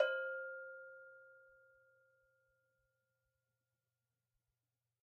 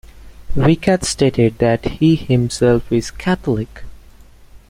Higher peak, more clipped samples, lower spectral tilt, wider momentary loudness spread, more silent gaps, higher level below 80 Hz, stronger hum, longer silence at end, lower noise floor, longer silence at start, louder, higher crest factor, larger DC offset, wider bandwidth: second, -20 dBFS vs -2 dBFS; neither; second, 3 dB/octave vs -6 dB/octave; first, 23 LU vs 7 LU; neither; second, under -90 dBFS vs -34 dBFS; neither; first, 3.65 s vs 0.15 s; first, under -90 dBFS vs -42 dBFS; second, 0 s vs 0.15 s; second, -45 LUFS vs -16 LUFS; first, 28 dB vs 16 dB; neither; second, 5.2 kHz vs 15.5 kHz